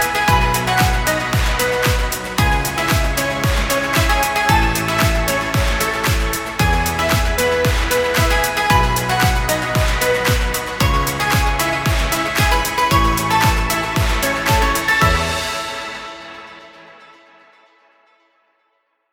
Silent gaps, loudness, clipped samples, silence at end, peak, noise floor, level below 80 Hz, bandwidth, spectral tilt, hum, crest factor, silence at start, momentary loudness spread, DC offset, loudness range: none; -16 LUFS; under 0.1%; 2.1 s; 0 dBFS; -66 dBFS; -24 dBFS; 19 kHz; -4 dB/octave; none; 16 dB; 0 s; 5 LU; under 0.1%; 3 LU